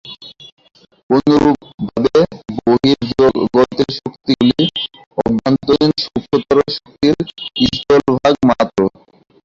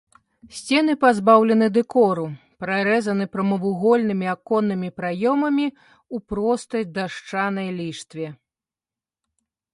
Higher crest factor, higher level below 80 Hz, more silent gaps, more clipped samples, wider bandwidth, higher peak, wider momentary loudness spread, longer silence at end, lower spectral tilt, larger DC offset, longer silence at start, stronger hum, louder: second, 14 dB vs 20 dB; first, -44 dBFS vs -58 dBFS; first, 0.52-0.57 s, 1.03-1.09 s, 1.74-1.78 s, 5.06-5.11 s vs none; neither; second, 7.6 kHz vs 11.5 kHz; about the same, 0 dBFS vs -2 dBFS; second, 9 LU vs 16 LU; second, 0.55 s vs 1.4 s; about the same, -6.5 dB/octave vs -6 dB/octave; neither; second, 0.05 s vs 0.45 s; neither; first, -15 LUFS vs -21 LUFS